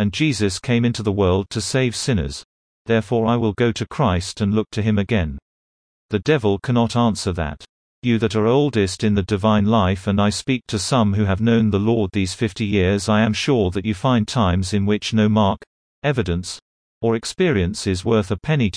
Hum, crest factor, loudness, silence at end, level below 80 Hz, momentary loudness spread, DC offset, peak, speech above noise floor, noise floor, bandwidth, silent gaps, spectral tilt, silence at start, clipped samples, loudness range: none; 16 dB; -20 LUFS; 0 s; -42 dBFS; 7 LU; under 0.1%; -4 dBFS; over 71 dB; under -90 dBFS; 10.5 kHz; 2.45-2.85 s, 5.42-6.09 s, 7.69-8.02 s, 15.67-16.02 s, 16.62-17.01 s; -6 dB/octave; 0 s; under 0.1%; 3 LU